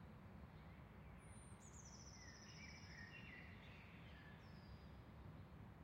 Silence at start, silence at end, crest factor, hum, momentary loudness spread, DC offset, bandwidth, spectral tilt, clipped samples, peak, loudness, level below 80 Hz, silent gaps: 0 s; 0 s; 14 dB; none; 4 LU; under 0.1%; 16 kHz; -4.5 dB/octave; under 0.1%; -46 dBFS; -60 LUFS; -68 dBFS; none